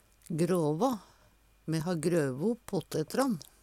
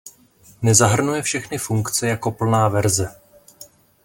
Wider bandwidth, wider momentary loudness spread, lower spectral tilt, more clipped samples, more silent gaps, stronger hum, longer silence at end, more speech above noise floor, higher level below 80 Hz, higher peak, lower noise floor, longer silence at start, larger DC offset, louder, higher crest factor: about the same, 16.5 kHz vs 17 kHz; about the same, 7 LU vs 9 LU; first, -6.5 dB/octave vs -4.5 dB/octave; neither; neither; neither; second, 0.2 s vs 0.4 s; about the same, 33 dB vs 33 dB; second, -64 dBFS vs -52 dBFS; second, -16 dBFS vs 0 dBFS; first, -63 dBFS vs -51 dBFS; first, 0.3 s vs 0.05 s; neither; second, -32 LUFS vs -19 LUFS; about the same, 16 dB vs 20 dB